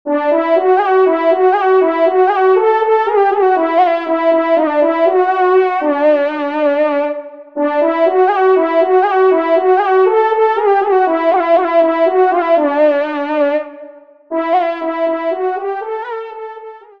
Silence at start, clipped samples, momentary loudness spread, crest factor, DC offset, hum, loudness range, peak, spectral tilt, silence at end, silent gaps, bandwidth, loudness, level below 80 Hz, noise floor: 0.05 s; under 0.1%; 9 LU; 12 dB; 0.3%; none; 5 LU; -2 dBFS; -5 dB/octave; 0.2 s; none; 5.4 kHz; -13 LUFS; -68 dBFS; -37 dBFS